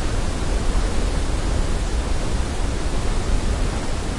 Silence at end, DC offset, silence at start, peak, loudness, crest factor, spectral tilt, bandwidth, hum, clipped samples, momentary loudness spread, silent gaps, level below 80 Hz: 0 s; under 0.1%; 0 s; -8 dBFS; -25 LUFS; 12 dB; -5 dB/octave; 11.5 kHz; none; under 0.1%; 2 LU; none; -22 dBFS